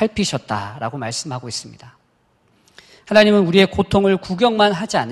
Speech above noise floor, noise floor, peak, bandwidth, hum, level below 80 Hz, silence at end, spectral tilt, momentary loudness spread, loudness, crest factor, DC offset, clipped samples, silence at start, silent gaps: 43 dB; -61 dBFS; 0 dBFS; 12 kHz; none; -44 dBFS; 0 s; -5 dB/octave; 14 LU; -17 LUFS; 18 dB; under 0.1%; under 0.1%; 0 s; none